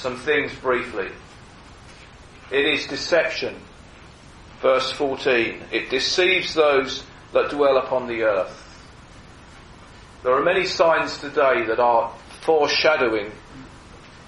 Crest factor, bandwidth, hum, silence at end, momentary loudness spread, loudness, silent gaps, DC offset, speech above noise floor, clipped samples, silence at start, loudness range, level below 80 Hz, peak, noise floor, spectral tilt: 18 dB; 11.5 kHz; none; 0.05 s; 13 LU; -21 LUFS; none; under 0.1%; 24 dB; under 0.1%; 0 s; 5 LU; -50 dBFS; -4 dBFS; -45 dBFS; -3.5 dB/octave